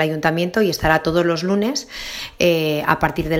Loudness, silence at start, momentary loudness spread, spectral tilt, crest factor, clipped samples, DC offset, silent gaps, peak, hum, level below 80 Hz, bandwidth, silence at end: -19 LUFS; 0 s; 9 LU; -5 dB/octave; 18 dB; under 0.1%; under 0.1%; none; 0 dBFS; none; -40 dBFS; 16.5 kHz; 0 s